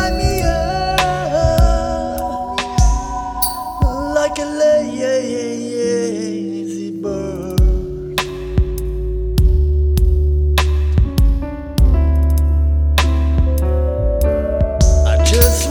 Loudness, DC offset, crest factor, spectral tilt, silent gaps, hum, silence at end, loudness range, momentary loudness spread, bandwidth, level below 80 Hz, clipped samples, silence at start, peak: -17 LUFS; under 0.1%; 14 dB; -5.5 dB/octave; none; none; 0 s; 4 LU; 8 LU; over 20 kHz; -16 dBFS; under 0.1%; 0 s; 0 dBFS